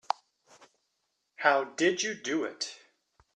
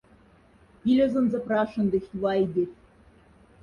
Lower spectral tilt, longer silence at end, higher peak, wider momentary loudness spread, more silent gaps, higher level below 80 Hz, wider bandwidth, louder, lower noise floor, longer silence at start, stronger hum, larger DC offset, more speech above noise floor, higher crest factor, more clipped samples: second, -2.5 dB/octave vs -8.5 dB/octave; second, 0.6 s vs 0.9 s; first, -8 dBFS vs -12 dBFS; first, 11 LU vs 7 LU; neither; second, -80 dBFS vs -58 dBFS; first, 10.5 kHz vs 6.8 kHz; second, -30 LUFS vs -25 LUFS; first, -80 dBFS vs -57 dBFS; first, 1.4 s vs 0.85 s; neither; neither; first, 51 dB vs 33 dB; first, 24 dB vs 14 dB; neither